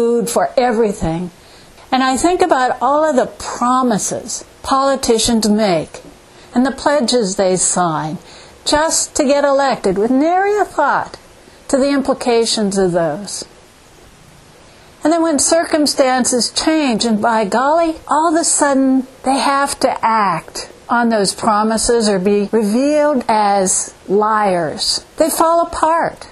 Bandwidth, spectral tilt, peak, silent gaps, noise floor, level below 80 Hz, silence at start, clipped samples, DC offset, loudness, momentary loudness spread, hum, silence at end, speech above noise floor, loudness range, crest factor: 14.5 kHz; -3.5 dB/octave; 0 dBFS; none; -43 dBFS; -44 dBFS; 0 s; under 0.1%; under 0.1%; -15 LUFS; 7 LU; none; 0 s; 29 dB; 3 LU; 16 dB